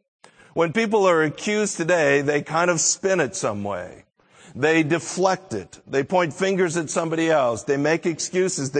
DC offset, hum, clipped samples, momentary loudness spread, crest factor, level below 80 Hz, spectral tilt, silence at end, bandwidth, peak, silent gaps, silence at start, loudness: under 0.1%; none; under 0.1%; 9 LU; 18 dB; -64 dBFS; -4 dB/octave; 0 s; 9.4 kHz; -4 dBFS; none; 0.55 s; -21 LUFS